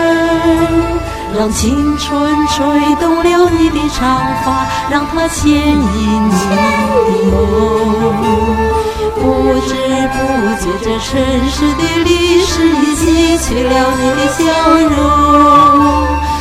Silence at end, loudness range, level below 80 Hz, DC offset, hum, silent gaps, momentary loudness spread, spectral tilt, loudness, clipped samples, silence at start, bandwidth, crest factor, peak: 0 s; 4 LU; -24 dBFS; under 0.1%; none; none; 5 LU; -5 dB/octave; -11 LUFS; under 0.1%; 0 s; 16 kHz; 10 dB; 0 dBFS